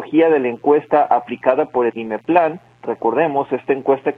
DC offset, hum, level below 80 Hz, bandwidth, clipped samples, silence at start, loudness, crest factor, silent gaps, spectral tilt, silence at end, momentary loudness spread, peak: under 0.1%; none; -62 dBFS; 4.2 kHz; under 0.1%; 0 s; -17 LUFS; 16 dB; none; -8.5 dB/octave; 0.05 s; 7 LU; 0 dBFS